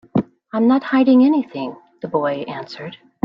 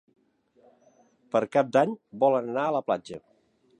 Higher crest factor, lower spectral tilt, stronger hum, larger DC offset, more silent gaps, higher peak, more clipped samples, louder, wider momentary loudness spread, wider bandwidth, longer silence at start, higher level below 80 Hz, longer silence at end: second, 14 dB vs 20 dB; first, -8.5 dB/octave vs -6.5 dB/octave; neither; neither; neither; first, -4 dBFS vs -8 dBFS; neither; first, -17 LUFS vs -26 LUFS; first, 19 LU vs 8 LU; second, 5.8 kHz vs 10 kHz; second, 0.15 s vs 1.35 s; first, -60 dBFS vs -76 dBFS; second, 0.3 s vs 0.6 s